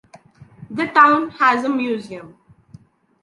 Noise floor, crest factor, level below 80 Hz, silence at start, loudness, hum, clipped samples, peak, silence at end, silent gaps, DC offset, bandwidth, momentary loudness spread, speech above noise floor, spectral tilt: -47 dBFS; 18 dB; -64 dBFS; 0.6 s; -16 LUFS; none; under 0.1%; -2 dBFS; 0.95 s; none; under 0.1%; 11.5 kHz; 20 LU; 30 dB; -5.5 dB/octave